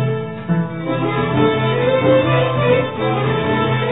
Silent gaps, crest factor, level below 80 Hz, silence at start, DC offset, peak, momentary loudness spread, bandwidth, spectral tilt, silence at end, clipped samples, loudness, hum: none; 14 dB; -44 dBFS; 0 s; 0.7%; -2 dBFS; 7 LU; 4 kHz; -10.5 dB/octave; 0 s; under 0.1%; -17 LUFS; none